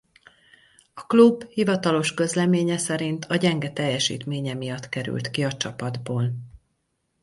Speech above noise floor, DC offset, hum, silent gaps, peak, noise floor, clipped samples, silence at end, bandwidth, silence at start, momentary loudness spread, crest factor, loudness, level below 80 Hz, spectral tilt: 51 dB; under 0.1%; none; none; -4 dBFS; -74 dBFS; under 0.1%; 0.65 s; 11.5 kHz; 0.95 s; 12 LU; 20 dB; -23 LUFS; -62 dBFS; -5 dB/octave